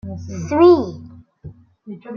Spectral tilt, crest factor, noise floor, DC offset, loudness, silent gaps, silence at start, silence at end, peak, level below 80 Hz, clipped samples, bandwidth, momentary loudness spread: -7.5 dB/octave; 16 dB; -40 dBFS; under 0.1%; -14 LUFS; none; 0.05 s; 0 s; -2 dBFS; -54 dBFS; under 0.1%; 6.8 kHz; 25 LU